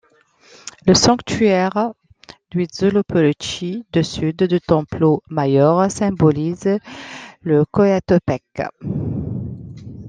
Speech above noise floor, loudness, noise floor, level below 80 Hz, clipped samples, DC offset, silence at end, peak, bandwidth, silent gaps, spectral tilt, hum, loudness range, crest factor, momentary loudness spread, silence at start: 36 dB; -18 LUFS; -53 dBFS; -46 dBFS; under 0.1%; under 0.1%; 0 s; -2 dBFS; 9.8 kHz; none; -5.5 dB/octave; none; 3 LU; 16 dB; 14 LU; 0.65 s